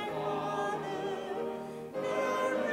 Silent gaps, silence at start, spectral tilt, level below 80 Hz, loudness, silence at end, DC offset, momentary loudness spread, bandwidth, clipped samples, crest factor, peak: none; 0 s; -5 dB/octave; -70 dBFS; -34 LUFS; 0 s; under 0.1%; 7 LU; 16 kHz; under 0.1%; 14 dB; -20 dBFS